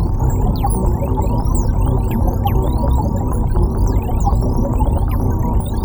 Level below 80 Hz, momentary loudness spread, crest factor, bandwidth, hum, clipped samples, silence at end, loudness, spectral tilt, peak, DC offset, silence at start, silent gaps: -18 dBFS; 1 LU; 12 dB; over 20 kHz; none; under 0.1%; 0 s; -18 LUFS; -8 dB/octave; -4 dBFS; under 0.1%; 0 s; none